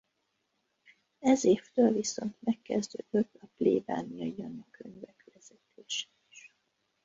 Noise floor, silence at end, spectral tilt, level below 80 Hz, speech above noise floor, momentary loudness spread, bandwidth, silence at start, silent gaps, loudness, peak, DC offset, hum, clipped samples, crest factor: -79 dBFS; 0.65 s; -4.5 dB/octave; -72 dBFS; 48 dB; 21 LU; 8 kHz; 1.2 s; none; -31 LUFS; -12 dBFS; under 0.1%; none; under 0.1%; 20 dB